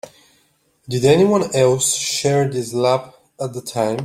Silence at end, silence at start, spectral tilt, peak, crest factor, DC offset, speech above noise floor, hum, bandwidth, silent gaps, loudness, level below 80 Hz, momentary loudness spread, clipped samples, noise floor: 0 s; 0.05 s; -4.5 dB/octave; -2 dBFS; 16 dB; under 0.1%; 43 dB; none; 16 kHz; none; -18 LUFS; -56 dBFS; 12 LU; under 0.1%; -61 dBFS